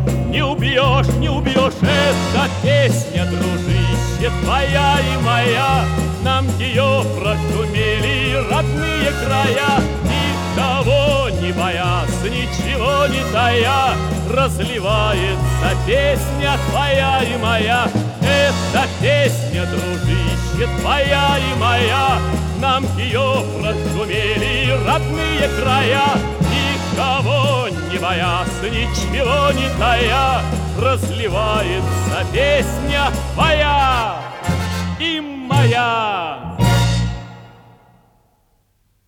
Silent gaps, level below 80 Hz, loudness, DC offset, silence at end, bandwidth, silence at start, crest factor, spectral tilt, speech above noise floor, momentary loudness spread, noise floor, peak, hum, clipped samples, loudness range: none; -28 dBFS; -17 LUFS; under 0.1%; 1.6 s; 17 kHz; 0 s; 16 dB; -5 dB/octave; 44 dB; 5 LU; -61 dBFS; -2 dBFS; none; under 0.1%; 1 LU